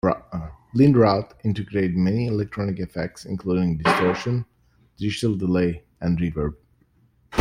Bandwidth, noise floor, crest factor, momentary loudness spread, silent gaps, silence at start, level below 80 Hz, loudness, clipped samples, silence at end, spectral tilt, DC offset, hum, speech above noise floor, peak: 11.5 kHz; -61 dBFS; 20 dB; 12 LU; none; 0.05 s; -46 dBFS; -23 LUFS; under 0.1%; 0 s; -7.5 dB/octave; under 0.1%; none; 39 dB; -4 dBFS